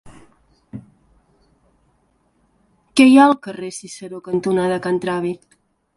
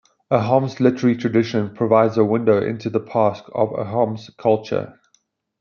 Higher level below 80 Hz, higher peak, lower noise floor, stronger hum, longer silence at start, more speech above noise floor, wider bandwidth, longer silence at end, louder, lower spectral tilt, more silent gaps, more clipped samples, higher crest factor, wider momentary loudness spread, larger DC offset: first, -58 dBFS vs -64 dBFS; about the same, 0 dBFS vs -2 dBFS; about the same, -62 dBFS vs -65 dBFS; neither; second, 0.05 s vs 0.3 s; about the same, 46 dB vs 46 dB; first, 11.5 kHz vs 7 kHz; about the same, 0.6 s vs 0.7 s; about the same, -17 LUFS vs -19 LUFS; second, -5.5 dB/octave vs -8 dB/octave; neither; neither; about the same, 20 dB vs 18 dB; first, 27 LU vs 7 LU; neither